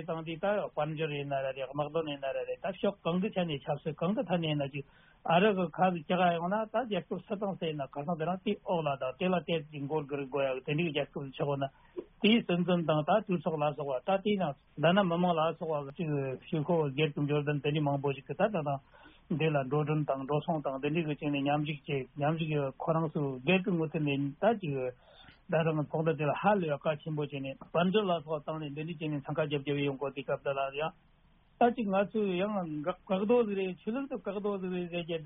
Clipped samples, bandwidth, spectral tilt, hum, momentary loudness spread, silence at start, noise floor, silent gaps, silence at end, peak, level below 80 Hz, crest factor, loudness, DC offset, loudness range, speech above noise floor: under 0.1%; 3.9 kHz; -4.5 dB/octave; none; 8 LU; 0 s; -64 dBFS; none; 0 s; -14 dBFS; -66 dBFS; 18 dB; -32 LUFS; under 0.1%; 3 LU; 33 dB